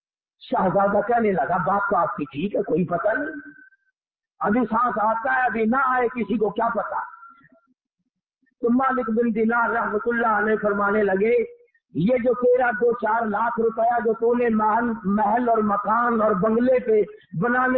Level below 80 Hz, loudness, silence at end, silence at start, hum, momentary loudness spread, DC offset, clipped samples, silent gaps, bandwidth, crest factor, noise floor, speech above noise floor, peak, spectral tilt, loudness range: -56 dBFS; -22 LUFS; 0 s; 0.45 s; none; 7 LU; under 0.1%; under 0.1%; none; 4.3 kHz; 12 dB; -80 dBFS; 59 dB; -10 dBFS; -11.5 dB/octave; 4 LU